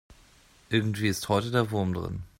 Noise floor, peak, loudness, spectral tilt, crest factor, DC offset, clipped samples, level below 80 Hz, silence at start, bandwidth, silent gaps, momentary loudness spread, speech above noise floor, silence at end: -58 dBFS; -10 dBFS; -28 LUFS; -5.5 dB/octave; 20 dB; under 0.1%; under 0.1%; -54 dBFS; 0.1 s; 16 kHz; none; 4 LU; 31 dB; 0.1 s